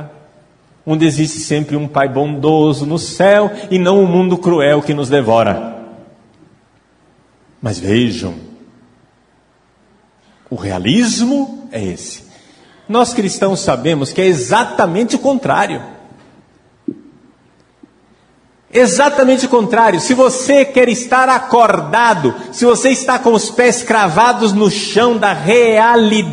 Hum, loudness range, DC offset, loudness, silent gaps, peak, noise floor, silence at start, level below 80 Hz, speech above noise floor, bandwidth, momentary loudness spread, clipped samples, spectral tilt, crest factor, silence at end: none; 11 LU; under 0.1%; -12 LUFS; none; 0 dBFS; -53 dBFS; 0 s; -52 dBFS; 41 dB; 10.5 kHz; 13 LU; 0.2%; -4.5 dB/octave; 14 dB; 0 s